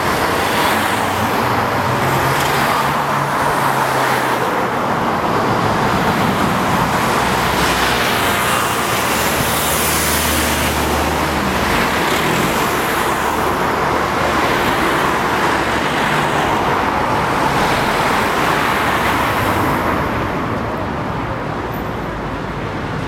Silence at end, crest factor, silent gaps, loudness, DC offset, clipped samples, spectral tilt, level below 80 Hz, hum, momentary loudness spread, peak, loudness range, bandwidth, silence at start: 0 s; 14 dB; none; -16 LUFS; under 0.1%; under 0.1%; -4 dB/octave; -34 dBFS; none; 6 LU; -2 dBFS; 1 LU; 16.5 kHz; 0 s